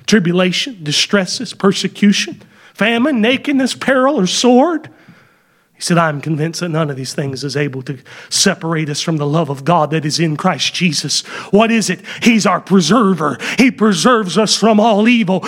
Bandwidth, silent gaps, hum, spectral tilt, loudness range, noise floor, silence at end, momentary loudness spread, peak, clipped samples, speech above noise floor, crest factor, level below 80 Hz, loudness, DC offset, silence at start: 16 kHz; none; none; -4.5 dB/octave; 5 LU; -54 dBFS; 0 s; 9 LU; 0 dBFS; under 0.1%; 40 dB; 14 dB; -58 dBFS; -14 LUFS; under 0.1%; 0.1 s